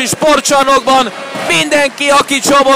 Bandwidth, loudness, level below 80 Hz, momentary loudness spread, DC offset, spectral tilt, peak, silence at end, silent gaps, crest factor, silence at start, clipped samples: 16 kHz; -10 LUFS; -44 dBFS; 4 LU; under 0.1%; -2 dB/octave; -2 dBFS; 0 s; none; 8 dB; 0 s; under 0.1%